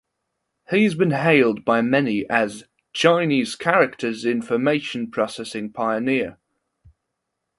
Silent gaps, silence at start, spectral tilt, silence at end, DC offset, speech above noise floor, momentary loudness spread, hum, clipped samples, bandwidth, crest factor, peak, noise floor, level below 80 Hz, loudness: none; 0.7 s; -5.5 dB/octave; 1.25 s; under 0.1%; 59 dB; 10 LU; none; under 0.1%; 11.5 kHz; 20 dB; -2 dBFS; -79 dBFS; -64 dBFS; -21 LUFS